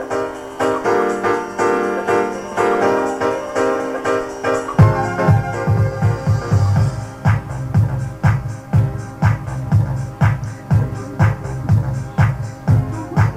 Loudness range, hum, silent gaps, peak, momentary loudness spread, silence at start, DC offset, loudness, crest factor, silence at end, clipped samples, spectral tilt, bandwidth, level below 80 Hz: 2 LU; none; none; 0 dBFS; 6 LU; 0 s; under 0.1%; -18 LUFS; 16 dB; 0 s; under 0.1%; -7.5 dB/octave; 11 kHz; -36 dBFS